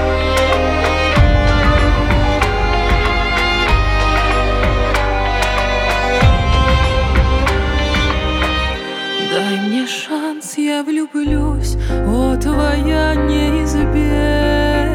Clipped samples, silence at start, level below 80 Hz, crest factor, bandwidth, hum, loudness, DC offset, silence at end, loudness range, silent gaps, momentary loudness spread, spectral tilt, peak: under 0.1%; 0 s; -18 dBFS; 14 dB; 14.5 kHz; none; -15 LUFS; under 0.1%; 0 s; 4 LU; none; 6 LU; -5.5 dB/octave; 0 dBFS